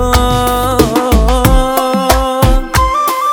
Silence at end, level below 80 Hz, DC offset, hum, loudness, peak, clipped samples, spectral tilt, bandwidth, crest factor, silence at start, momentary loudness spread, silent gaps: 0 s; -16 dBFS; under 0.1%; none; -11 LUFS; 0 dBFS; 0.8%; -5 dB/octave; over 20 kHz; 10 dB; 0 s; 2 LU; none